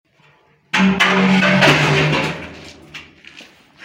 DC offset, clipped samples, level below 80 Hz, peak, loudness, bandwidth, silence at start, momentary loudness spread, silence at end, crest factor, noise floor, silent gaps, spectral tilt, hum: under 0.1%; under 0.1%; -50 dBFS; -2 dBFS; -14 LUFS; 15.5 kHz; 0.75 s; 24 LU; 0.4 s; 14 dB; -54 dBFS; none; -5 dB/octave; none